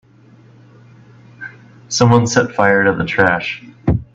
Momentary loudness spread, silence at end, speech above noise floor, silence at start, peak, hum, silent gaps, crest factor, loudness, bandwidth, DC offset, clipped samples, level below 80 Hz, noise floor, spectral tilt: 21 LU; 0.1 s; 32 dB; 1.4 s; 0 dBFS; none; none; 16 dB; -15 LUFS; 7.8 kHz; under 0.1%; under 0.1%; -38 dBFS; -46 dBFS; -5 dB/octave